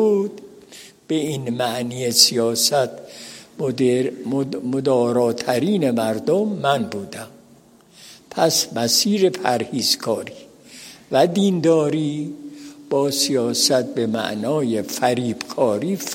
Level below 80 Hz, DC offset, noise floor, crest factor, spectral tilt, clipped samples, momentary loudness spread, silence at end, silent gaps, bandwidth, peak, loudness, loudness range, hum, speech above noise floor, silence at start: -66 dBFS; under 0.1%; -50 dBFS; 20 dB; -4 dB/octave; under 0.1%; 16 LU; 0 s; none; 16.5 kHz; 0 dBFS; -20 LUFS; 2 LU; none; 31 dB; 0 s